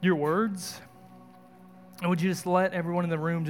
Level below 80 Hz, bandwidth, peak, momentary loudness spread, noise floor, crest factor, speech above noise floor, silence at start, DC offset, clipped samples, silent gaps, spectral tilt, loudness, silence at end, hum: -76 dBFS; 17 kHz; -10 dBFS; 11 LU; -52 dBFS; 18 dB; 25 dB; 0 s; under 0.1%; under 0.1%; none; -6.5 dB/octave; -28 LUFS; 0 s; none